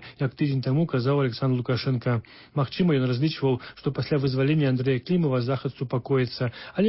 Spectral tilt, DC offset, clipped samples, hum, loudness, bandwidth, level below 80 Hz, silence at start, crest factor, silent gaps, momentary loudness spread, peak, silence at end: -11.5 dB/octave; under 0.1%; under 0.1%; none; -25 LUFS; 5.8 kHz; -58 dBFS; 0 s; 14 dB; none; 7 LU; -12 dBFS; 0 s